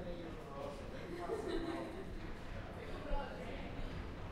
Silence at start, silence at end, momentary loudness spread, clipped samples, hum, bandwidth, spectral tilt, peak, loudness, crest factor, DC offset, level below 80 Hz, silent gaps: 0 s; 0 s; 7 LU; under 0.1%; none; 13 kHz; -6.5 dB/octave; -26 dBFS; -46 LUFS; 18 dB; under 0.1%; -48 dBFS; none